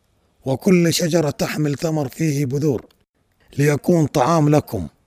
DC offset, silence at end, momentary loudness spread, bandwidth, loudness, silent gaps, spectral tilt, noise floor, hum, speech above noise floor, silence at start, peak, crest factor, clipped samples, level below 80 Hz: under 0.1%; 0.2 s; 10 LU; 16 kHz; -19 LUFS; none; -6 dB/octave; -62 dBFS; none; 44 dB; 0.45 s; -4 dBFS; 16 dB; under 0.1%; -50 dBFS